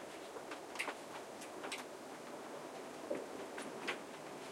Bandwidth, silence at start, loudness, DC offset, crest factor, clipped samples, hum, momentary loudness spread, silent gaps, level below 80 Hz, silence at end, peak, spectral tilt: 16.5 kHz; 0 s; -46 LUFS; under 0.1%; 22 dB; under 0.1%; none; 6 LU; none; -86 dBFS; 0 s; -24 dBFS; -2.5 dB/octave